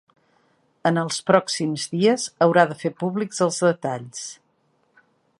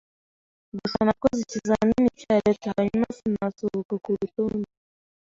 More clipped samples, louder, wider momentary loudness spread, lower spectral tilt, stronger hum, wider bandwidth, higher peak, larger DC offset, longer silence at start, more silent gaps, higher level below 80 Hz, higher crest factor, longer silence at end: neither; first, -21 LUFS vs -25 LUFS; first, 11 LU vs 8 LU; second, -4.5 dB/octave vs -6.5 dB/octave; neither; first, 11.5 kHz vs 7.6 kHz; first, -2 dBFS vs -6 dBFS; neither; about the same, 0.85 s vs 0.75 s; second, none vs 3.85-3.89 s; second, -72 dBFS vs -52 dBFS; about the same, 22 dB vs 20 dB; first, 1.05 s vs 0.65 s